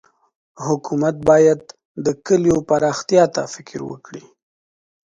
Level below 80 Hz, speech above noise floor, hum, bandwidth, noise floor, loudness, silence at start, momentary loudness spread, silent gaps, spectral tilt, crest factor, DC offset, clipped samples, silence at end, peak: -52 dBFS; over 73 dB; none; 9.4 kHz; under -90 dBFS; -17 LUFS; 0.6 s; 17 LU; 1.85-1.95 s; -5.5 dB/octave; 18 dB; under 0.1%; under 0.1%; 0.85 s; 0 dBFS